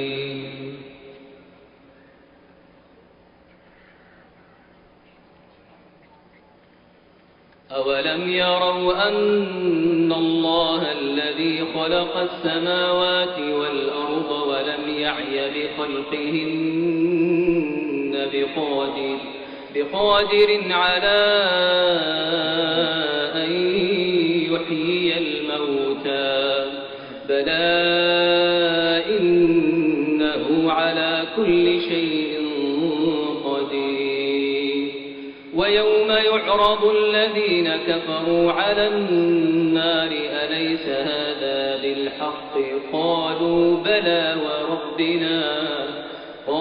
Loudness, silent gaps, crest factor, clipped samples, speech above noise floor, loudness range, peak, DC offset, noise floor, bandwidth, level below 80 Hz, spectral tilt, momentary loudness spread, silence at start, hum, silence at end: -20 LUFS; none; 16 dB; under 0.1%; 33 dB; 5 LU; -6 dBFS; under 0.1%; -53 dBFS; 5.2 kHz; -56 dBFS; -2 dB/octave; 8 LU; 0 s; none; 0 s